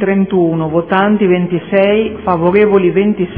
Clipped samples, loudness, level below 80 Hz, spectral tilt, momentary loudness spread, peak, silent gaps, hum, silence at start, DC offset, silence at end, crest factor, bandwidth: under 0.1%; -12 LUFS; -44 dBFS; -11 dB/octave; 5 LU; 0 dBFS; none; none; 0 s; 0.4%; 0 s; 12 dB; 3.6 kHz